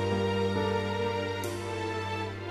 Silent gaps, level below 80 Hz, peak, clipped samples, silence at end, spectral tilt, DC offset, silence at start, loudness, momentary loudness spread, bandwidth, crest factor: none; -58 dBFS; -18 dBFS; under 0.1%; 0 s; -6 dB/octave; under 0.1%; 0 s; -31 LUFS; 5 LU; 13.5 kHz; 14 dB